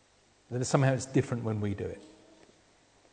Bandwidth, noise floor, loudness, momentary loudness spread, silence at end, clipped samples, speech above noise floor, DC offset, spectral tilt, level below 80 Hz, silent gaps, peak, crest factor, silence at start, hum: 9.4 kHz; -65 dBFS; -31 LUFS; 13 LU; 1 s; under 0.1%; 35 dB; under 0.1%; -6 dB/octave; -64 dBFS; none; -8 dBFS; 24 dB; 0.5 s; none